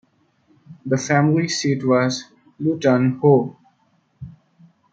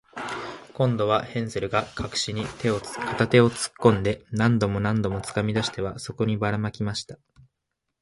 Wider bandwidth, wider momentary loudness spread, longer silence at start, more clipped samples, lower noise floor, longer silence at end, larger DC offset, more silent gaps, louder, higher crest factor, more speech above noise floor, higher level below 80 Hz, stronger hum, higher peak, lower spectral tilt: second, 9 kHz vs 11.5 kHz; first, 23 LU vs 11 LU; first, 0.7 s vs 0.15 s; neither; second, -63 dBFS vs -81 dBFS; second, 0.6 s vs 0.85 s; neither; neither; first, -19 LUFS vs -25 LUFS; about the same, 18 dB vs 22 dB; second, 45 dB vs 57 dB; second, -62 dBFS vs -50 dBFS; neither; about the same, -2 dBFS vs -4 dBFS; about the same, -6 dB/octave vs -5.5 dB/octave